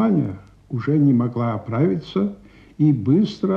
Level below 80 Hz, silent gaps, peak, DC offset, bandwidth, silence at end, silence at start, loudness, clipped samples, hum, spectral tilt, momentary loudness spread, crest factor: -54 dBFS; none; -6 dBFS; under 0.1%; 6.8 kHz; 0 s; 0 s; -20 LUFS; under 0.1%; none; -9.5 dB/octave; 10 LU; 14 dB